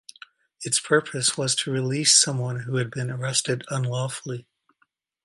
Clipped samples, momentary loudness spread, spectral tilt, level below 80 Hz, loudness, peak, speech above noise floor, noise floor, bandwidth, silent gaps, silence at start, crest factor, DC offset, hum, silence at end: under 0.1%; 13 LU; -3 dB/octave; -68 dBFS; -23 LUFS; -2 dBFS; 45 dB; -69 dBFS; 11.5 kHz; none; 0.6 s; 22 dB; under 0.1%; none; 0.85 s